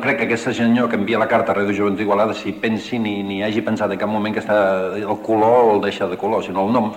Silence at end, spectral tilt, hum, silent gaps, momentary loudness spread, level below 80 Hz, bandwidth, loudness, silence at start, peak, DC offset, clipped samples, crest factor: 0 s; -6.5 dB/octave; none; none; 7 LU; -58 dBFS; 16 kHz; -18 LUFS; 0 s; -2 dBFS; under 0.1%; under 0.1%; 16 dB